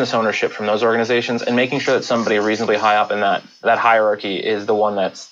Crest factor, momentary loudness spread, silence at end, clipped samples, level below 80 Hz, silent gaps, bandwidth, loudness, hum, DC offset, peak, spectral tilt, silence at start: 16 dB; 5 LU; 0.05 s; under 0.1%; -68 dBFS; none; 7.8 kHz; -17 LUFS; none; under 0.1%; -2 dBFS; -4.5 dB/octave; 0 s